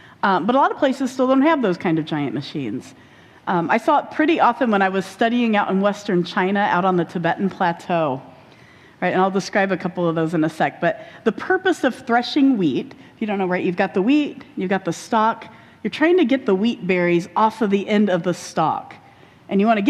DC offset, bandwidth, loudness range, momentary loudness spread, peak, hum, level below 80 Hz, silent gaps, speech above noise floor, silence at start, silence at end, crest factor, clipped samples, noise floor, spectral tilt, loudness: under 0.1%; 13 kHz; 3 LU; 8 LU; -4 dBFS; none; -64 dBFS; none; 28 dB; 0.25 s; 0 s; 16 dB; under 0.1%; -47 dBFS; -6 dB/octave; -20 LUFS